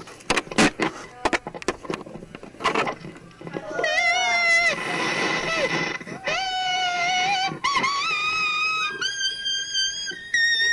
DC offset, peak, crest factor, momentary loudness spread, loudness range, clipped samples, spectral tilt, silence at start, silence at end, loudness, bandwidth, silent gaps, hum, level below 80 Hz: under 0.1%; -8 dBFS; 16 dB; 13 LU; 4 LU; under 0.1%; -2 dB/octave; 0 s; 0 s; -22 LUFS; 11.5 kHz; none; none; -54 dBFS